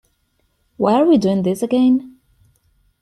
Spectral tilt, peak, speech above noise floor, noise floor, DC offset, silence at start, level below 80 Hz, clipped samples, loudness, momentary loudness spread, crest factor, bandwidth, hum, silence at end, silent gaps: -7.5 dB/octave; -2 dBFS; 50 dB; -65 dBFS; under 0.1%; 0.8 s; -56 dBFS; under 0.1%; -16 LUFS; 6 LU; 16 dB; 13 kHz; none; 0.9 s; none